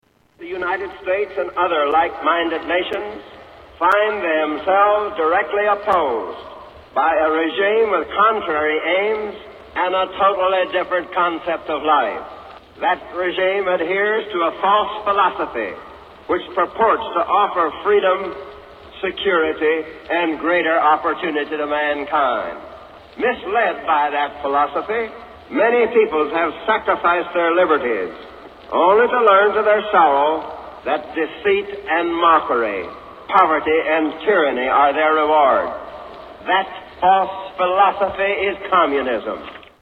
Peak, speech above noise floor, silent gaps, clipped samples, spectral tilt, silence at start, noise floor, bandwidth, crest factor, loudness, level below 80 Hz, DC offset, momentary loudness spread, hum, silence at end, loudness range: 0 dBFS; 22 dB; none; under 0.1%; -6 dB/octave; 0.4 s; -39 dBFS; 5.6 kHz; 18 dB; -18 LUFS; -52 dBFS; under 0.1%; 14 LU; none; 0.2 s; 4 LU